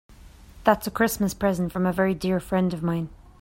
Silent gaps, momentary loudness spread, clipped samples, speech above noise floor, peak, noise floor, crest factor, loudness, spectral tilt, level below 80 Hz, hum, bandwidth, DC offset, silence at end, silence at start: none; 5 LU; under 0.1%; 23 dB; -4 dBFS; -47 dBFS; 22 dB; -24 LUFS; -6 dB/octave; -48 dBFS; none; 16.5 kHz; under 0.1%; 0.25 s; 0.1 s